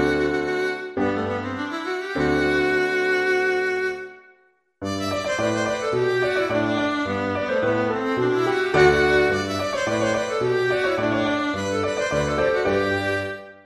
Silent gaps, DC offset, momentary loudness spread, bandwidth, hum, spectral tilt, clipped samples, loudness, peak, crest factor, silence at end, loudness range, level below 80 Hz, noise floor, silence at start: none; under 0.1%; 7 LU; 12.5 kHz; none; -5 dB/octave; under 0.1%; -22 LUFS; -4 dBFS; 18 dB; 0.1 s; 3 LU; -46 dBFS; -60 dBFS; 0 s